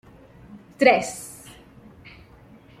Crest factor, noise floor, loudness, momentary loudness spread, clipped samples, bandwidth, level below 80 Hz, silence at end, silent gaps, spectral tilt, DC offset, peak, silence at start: 24 dB; -49 dBFS; -20 LUFS; 25 LU; under 0.1%; 15.5 kHz; -58 dBFS; 1.5 s; none; -3.5 dB/octave; under 0.1%; -2 dBFS; 0.55 s